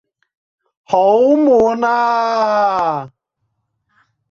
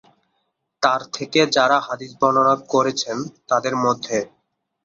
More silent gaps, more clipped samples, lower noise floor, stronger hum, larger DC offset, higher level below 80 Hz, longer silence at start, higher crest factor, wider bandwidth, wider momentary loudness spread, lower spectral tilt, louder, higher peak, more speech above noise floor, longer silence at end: neither; neither; about the same, -71 dBFS vs -73 dBFS; neither; neither; first, -56 dBFS vs -64 dBFS; about the same, 0.9 s vs 0.8 s; second, 14 dB vs 20 dB; about the same, 7.4 kHz vs 7.8 kHz; second, 7 LU vs 10 LU; first, -6 dB/octave vs -3.5 dB/octave; first, -14 LUFS vs -20 LUFS; about the same, -2 dBFS vs -2 dBFS; first, 58 dB vs 53 dB; first, 1.25 s vs 0.6 s